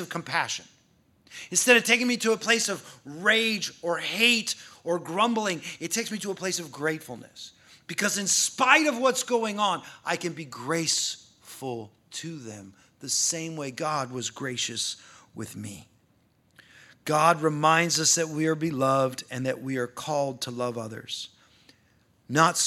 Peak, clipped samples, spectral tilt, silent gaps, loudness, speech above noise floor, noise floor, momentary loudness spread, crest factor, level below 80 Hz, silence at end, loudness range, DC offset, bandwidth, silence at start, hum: -2 dBFS; under 0.1%; -2.5 dB/octave; none; -25 LUFS; 38 dB; -65 dBFS; 19 LU; 26 dB; -74 dBFS; 0 s; 7 LU; under 0.1%; 16.5 kHz; 0 s; none